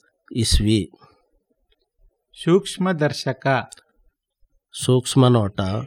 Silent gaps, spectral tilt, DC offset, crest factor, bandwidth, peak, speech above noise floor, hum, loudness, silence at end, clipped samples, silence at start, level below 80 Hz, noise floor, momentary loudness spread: none; -5.5 dB/octave; under 0.1%; 18 dB; 16 kHz; -4 dBFS; 48 dB; none; -20 LUFS; 0 s; under 0.1%; 0.3 s; -34 dBFS; -67 dBFS; 13 LU